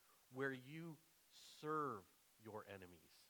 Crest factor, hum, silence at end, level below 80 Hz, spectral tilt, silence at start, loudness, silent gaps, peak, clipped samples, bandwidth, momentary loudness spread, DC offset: 20 dB; none; 0 s; under -90 dBFS; -5.5 dB/octave; 0 s; -50 LUFS; none; -32 dBFS; under 0.1%; 19.5 kHz; 18 LU; under 0.1%